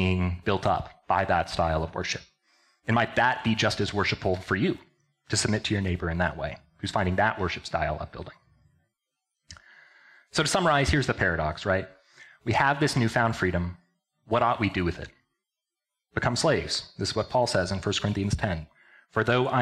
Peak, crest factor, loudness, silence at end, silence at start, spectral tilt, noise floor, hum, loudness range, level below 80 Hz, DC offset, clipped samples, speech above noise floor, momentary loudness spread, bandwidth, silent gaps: -8 dBFS; 18 dB; -27 LUFS; 0 s; 0 s; -5 dB/octave; -88 dBFS; none; 4 LU; -46 dBFS; under 0.1%; under 0.1%; 62 dB; 11 LU; 13.5 kHz; none